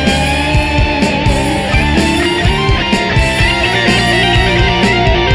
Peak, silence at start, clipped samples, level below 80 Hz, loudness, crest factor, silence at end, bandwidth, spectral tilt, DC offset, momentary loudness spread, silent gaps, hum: 0 dBFS; 0 s; under 0.1%; -18 dBFS; -11 LUFS; 10 dB; 0 s; 11 kHz; -5 dB/octave; 0.2%; 3 LU; none; none